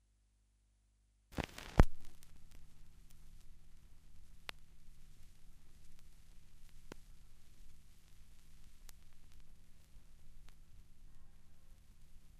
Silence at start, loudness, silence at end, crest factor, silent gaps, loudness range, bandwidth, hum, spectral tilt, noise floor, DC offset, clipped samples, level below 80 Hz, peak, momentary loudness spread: 1.3 s; -39 LUFS; 0 s; 36 dB; none; 23 LU; 13.5 kHz; 50 Hz at -70 dBFS; -6.5 dB/octave; -74 dBFS; under 0.1%; under 0.1%; -46 dBFS; -6 dBFS; 21 LU